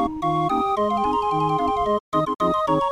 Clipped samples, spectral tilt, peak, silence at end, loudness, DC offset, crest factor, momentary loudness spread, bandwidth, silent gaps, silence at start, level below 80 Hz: under 0.1%; -7 dB/octave; -8 dBFS; 0 s; -22 LUFS; under 0.1%; 12 dB; 2 LU; 13.5 kHz; 2.00-2.12 s; 0 s; -46 dBFS